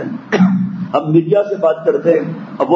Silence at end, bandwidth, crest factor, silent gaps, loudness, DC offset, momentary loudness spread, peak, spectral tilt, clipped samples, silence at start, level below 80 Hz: 0 s; 6.4 kHz; 14 dB; none; -15 LUFS; under 0.1%; 6 LU; 0 dBFS; -8.5 dB/octave; under 0.1%; 0 s; -64 dBFS